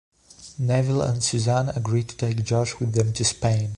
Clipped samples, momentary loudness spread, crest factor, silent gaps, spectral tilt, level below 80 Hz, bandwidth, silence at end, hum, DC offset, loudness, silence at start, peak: under 0.1%; 5 LU; 16 dB; none; -5 dB/octave; -48 dBFS; 11 kHz; 0 s; none; under 0.1%; -23 LUFS; 0.4 s; -8 dBFS